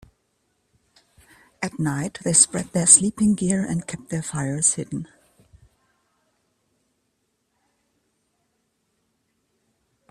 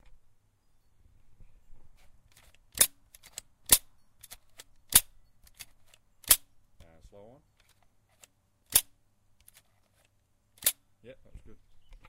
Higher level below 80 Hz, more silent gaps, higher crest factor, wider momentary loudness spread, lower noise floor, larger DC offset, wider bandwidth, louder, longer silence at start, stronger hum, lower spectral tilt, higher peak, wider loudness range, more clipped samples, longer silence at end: about the same, -58 dBFS vs -54 dBFS; neither; second, 26 dB vs 32 dB; second, 18 LU vs 27 LU; about the same, -73 dBFS vs -70 dBFS; neither; about the same, 15.5 kHz vs 16 kHz; first, -20 LUFS vs -25 LUFS; second, 1.6 s vs 1.75 s; neither; first, -3.5 dB/octave vs 0.5 dB/octave; about the same, 0 dBFS vs -2 dBFS; about the same, 9 LU vs 7 LU; neither; first, 5.05 s vs 0.6 s